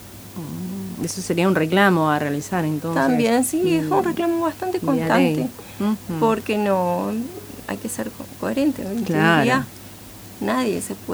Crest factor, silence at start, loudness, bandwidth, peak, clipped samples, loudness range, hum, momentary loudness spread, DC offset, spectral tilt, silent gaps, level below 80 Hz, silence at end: 18 dB; 0 s; -21 LUFS; over 20 kHz; -4 dBFS; under 0.1%; 4 LU; none; 15 LU; under 0.1%; -5.5 dB/octave; none; -54 dBFS; 0 s